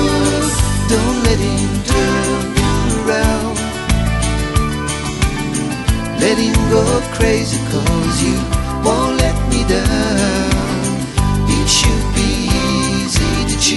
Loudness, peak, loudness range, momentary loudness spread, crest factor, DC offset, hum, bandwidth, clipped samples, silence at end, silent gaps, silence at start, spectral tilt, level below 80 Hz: -15 LUFS; 0 dBFS; 2 LU; 5 LU; 14 dB; under 0.1%; none; 12 kHz; under 0.1%; 0 s; none; 0 s; -4.5 dB/octave; -22 dBFS